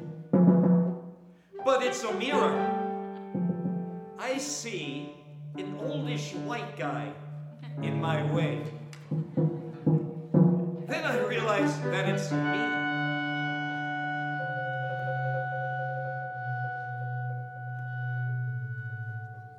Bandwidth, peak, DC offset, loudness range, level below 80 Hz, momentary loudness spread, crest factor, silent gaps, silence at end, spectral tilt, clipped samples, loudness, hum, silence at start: 12 kHz; -10 dBFS; under 0.1%; 7 LU; -74 dBFS; 13 LU; 20 dB; none; 0 s; -6 dB/octave; under 0.1%; -30 LUFS; none; 0 s